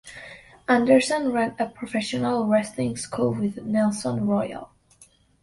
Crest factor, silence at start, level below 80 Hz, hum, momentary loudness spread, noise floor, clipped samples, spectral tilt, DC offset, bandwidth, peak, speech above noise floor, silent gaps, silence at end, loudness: 18 dB; 0.05 s; -58 dBFS; none; 16 LU; -56 dBFS; under 0.1%; -5.5 dB/octave; under 0.1%; 11.5 kHz; -6 dBFS; 33 dB; none; 0.75 s; -24 LUFS